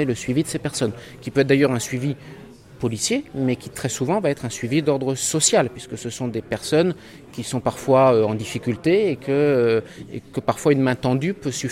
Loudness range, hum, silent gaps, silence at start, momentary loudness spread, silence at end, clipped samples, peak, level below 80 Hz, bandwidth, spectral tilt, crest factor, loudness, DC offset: 3 LU; none; none; 0 s; 11 LU; 0 s; under 0.1%; -4 dBFS; -54 dBFS; 16 kHz; -5 dB/octave; 18 dB; -21 LUFS; under 0.1%